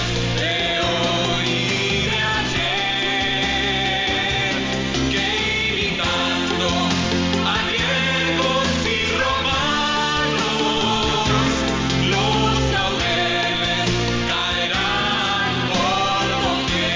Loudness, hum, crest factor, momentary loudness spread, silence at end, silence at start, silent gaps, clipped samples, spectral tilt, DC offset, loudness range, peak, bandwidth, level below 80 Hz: -19 LUFS; none; 12 dB; 2 LU; 0 s; 0 s; none; under 0.1%; -4 dB/octave; under 0.1%; 1 LU; -8 dBFS; 7.6 kHz; -36 dBFS